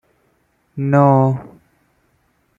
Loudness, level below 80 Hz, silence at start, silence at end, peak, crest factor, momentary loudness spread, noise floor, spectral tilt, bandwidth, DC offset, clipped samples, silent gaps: -15 LUFS; -58 dBFS; 0.75 s; 1.1 s; -2 dBFS; 18 dB; 16 LU; -62 dBFS; -11 dB/octave; 3.7 kHz; under 0.1%; under 0.1%; none